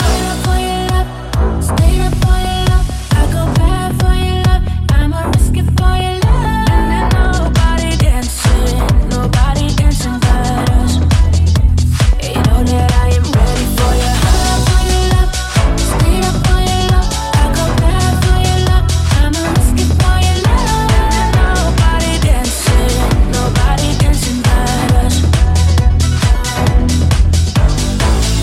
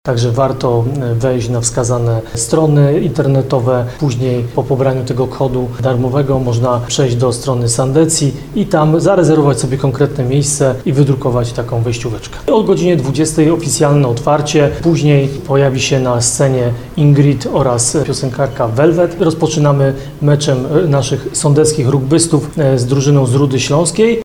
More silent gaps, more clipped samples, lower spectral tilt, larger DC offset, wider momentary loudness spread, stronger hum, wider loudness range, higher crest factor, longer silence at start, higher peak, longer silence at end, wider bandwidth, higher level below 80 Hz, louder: neither; neither; about the same, -5 dB/octave vs -6 dB/octave; second, under 0.1% vs 0.4%; second, 2 LU vs 6 LU; neither; about the same, 1 LU vs 2 LU; about the same, 10 dB vs 12 dB; about the same, 0 s vs 0.05 s; about the same, 0 dBFS vs 0 dBFS; about the same, 0 s vs 0 s; first, 15.5 kHz vs 14 kHz; first, -14 dBFS vs -36 dBFS; about the same, -13 LUFS vs -13 LUFS